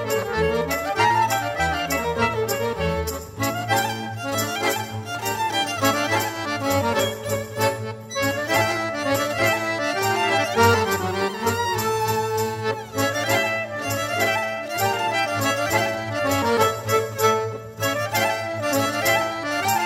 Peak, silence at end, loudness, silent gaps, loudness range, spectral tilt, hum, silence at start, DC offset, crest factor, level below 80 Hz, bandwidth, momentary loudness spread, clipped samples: -4 dBFS; 0 s; -22 LUFS; none; 3 LU; -3.5 dB/octave; none; 0 s; under 0.1%; 18 dB; -46 dBFS; 16 kHz; 6 LU; under 0.1%